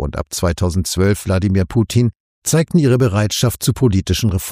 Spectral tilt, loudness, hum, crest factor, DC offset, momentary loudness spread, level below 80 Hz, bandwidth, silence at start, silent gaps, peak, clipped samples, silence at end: -5.5 dB/octave; -16 LUFS; none; 14 dB; under 0.1%; 6 LU; -36 dBFS; 15.5 kHz; 0 s; 2.16-2.42 s; -2 dBFS; under 0.1%; 0 s